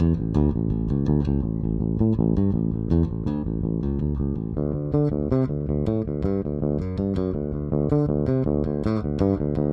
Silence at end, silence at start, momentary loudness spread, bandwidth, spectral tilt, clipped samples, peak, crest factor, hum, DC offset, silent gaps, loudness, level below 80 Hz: 0 s; 0 s; 5 LU; 6 kHz; -11.5 dB/octave; under 0.1%; -8 dBFS; 16 dB; none; under 0.1%; none; -24 LUFS; -32 dBFS